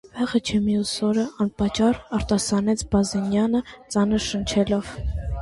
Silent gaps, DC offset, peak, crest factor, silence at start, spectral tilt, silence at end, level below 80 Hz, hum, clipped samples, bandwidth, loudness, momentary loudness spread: none; under 0.1%; -8 dBFS; 16 dB; 0.05 s; -5 dB/octave; 0 s; -36 dBFS; none; under 0.1%; 11.5 kHz; -23 LUFS; 5 LU